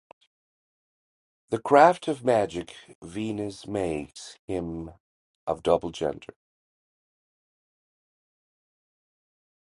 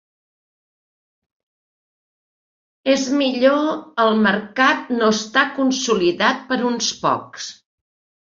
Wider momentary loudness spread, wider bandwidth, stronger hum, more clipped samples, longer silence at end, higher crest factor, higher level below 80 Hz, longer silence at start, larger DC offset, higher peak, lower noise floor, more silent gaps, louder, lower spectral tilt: first, 23 LU vs 7 LU; first, 11.5 kHz vs 7.6 kHz; neither; neither; first, 3.45 s vs 0.75 s; first, 26 dB vs 20 dB; first, -56 dBFS vs -64 dBFS; second, 1.5 s vs 2.85 s; neither; about the same, -4 dBFS vs -2 dBFS; about the same, under -90 dBFS vs under -90 dBFS; first, 2.95-3.02 s, 4.39-4.48 s, 5.00-5.47 s vs none; second, -26 LUFS vs -18 LUFS; first, -5.5 dB/octave vs -3.5 dB/octave